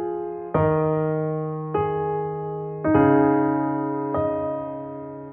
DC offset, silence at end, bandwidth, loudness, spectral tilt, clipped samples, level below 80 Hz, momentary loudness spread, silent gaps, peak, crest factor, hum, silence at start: under 0.1%; 0 s; 3.4 kHz; -23 LUFS; -9 dB/octave; under 0.1%; -50 dBFS; 12 LU; none; -6 dBFS; 18 dB; none; 0 s